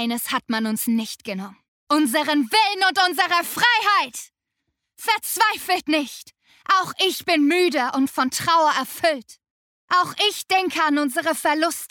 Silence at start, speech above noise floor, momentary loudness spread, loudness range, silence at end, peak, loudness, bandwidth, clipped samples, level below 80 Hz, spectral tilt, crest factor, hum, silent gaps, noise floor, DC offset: 0 s; 57 dB; 11 LU; 2 LU; 0.05 s; -4 dBFS; -20 LUFS; 20 kHz; under 0.1%; -68 dBFS; -2 dB/octave; 16 dB; none; 1.68-1.87 s, 9.51-9.88 s; -78 dBFS; under 0.1%